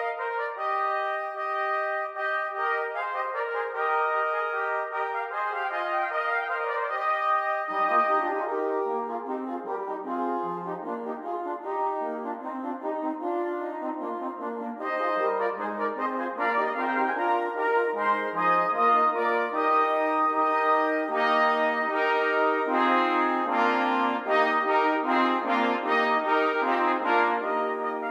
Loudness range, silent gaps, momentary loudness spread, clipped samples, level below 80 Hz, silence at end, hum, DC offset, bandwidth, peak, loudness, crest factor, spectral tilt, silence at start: 8 LU; none; 10 LU; under 0.1%; -84 dBFS; 0 s; none; under 0.1%; 12 kHz; -10 dBFS; -26 LUFS; 16 dB; -5 dB/octave; 0 s